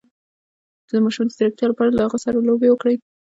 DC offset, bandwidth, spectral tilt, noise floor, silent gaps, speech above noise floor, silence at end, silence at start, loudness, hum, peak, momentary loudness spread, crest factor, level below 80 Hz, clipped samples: under 0.1%; 8 kHz; -6 dB/octave; under -90 dBFS; none; over 72 dB; 0.3 s; 0.95 s; -19 LUFS; none; -6 dBFS; 4 LU; 14 dB; -54 dBFS; under 0.1%